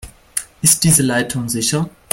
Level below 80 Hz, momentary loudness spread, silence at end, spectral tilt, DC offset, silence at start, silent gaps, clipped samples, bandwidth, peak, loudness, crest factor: -44 dBFS; 14 LU; 0.25 s; -3.5 dB/octave; under 0.1%; 0.05 s; none; under 0.1%; 16.5 kHz; 0 dBFS; -15 LUFS; 18 dB